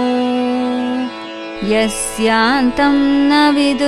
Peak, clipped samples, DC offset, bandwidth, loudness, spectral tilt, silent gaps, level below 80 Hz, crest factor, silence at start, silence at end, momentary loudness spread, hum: -2 dBFS; under 0.1%; under 0.1%; 13 kHz; -15 LUFS; -3.5 dB/octave; none; -40 dBFS; 14 dB; 0 s; 0 s; 11 LU; none